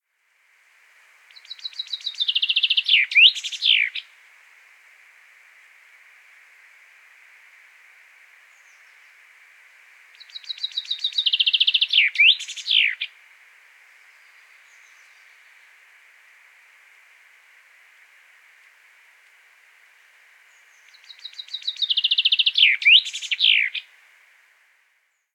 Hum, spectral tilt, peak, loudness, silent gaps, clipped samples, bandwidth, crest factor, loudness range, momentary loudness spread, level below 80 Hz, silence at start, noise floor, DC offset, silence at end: none; 10 dB/octave; -2 dBFS; -17 LUFS; none; under 0.1%; 16.5 kHz; 24 dB; 14 LU; 20 LU; under -90 dBFS; 1.5 s; -67 dBFS; under 0.1%; 1.55 s